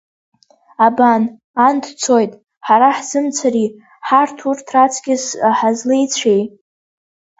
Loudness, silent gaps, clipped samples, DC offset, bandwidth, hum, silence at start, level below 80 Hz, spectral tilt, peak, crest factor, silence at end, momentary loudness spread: -15 LUFS; 1.44-1.54 s, 2.57-2.61 s; under 0.1%; under 0.1%; 8 kHz; none; 0.8 s; -64 dBFS; -3.5 dB/octave; 0 dBFS; 16 dB; 0.9 s; 9 LU